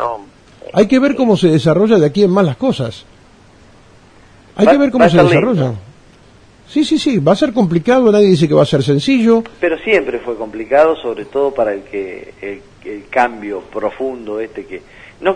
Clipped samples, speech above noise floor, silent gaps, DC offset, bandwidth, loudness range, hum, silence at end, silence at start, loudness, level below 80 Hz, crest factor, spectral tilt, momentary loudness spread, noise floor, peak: under 0.1%; 31 dB; none; under 0.1%; 10.5 kHz; 8 LU; none; 0 s; 0 s; -13 LUFS; -46 dBFS; 14 dB; -7 dB/octave; 18 LU; -44 dBFS; 0 dBFS